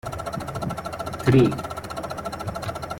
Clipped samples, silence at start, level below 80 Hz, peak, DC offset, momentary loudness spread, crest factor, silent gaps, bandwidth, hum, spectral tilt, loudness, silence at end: under 0.1%; 0.05 s; -46 dBFS; -6 dBFS; under 0.1%; 13 LU; 20 dB; none; 17 kHz; none; -7 dB/octave; -25 LUFS; 0 s